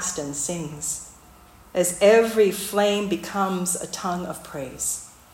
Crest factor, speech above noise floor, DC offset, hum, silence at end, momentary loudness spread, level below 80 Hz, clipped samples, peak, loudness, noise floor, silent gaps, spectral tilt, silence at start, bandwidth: 18 dB; 27 dB; under 0.1%; none; 0.25 s; 15 LU; -54 dBFS; under 0.1%; -6 dBFS; -23 LUFS; -49 dBFS; none; -3.5 dB/octave; 0 s; 16.5 kHz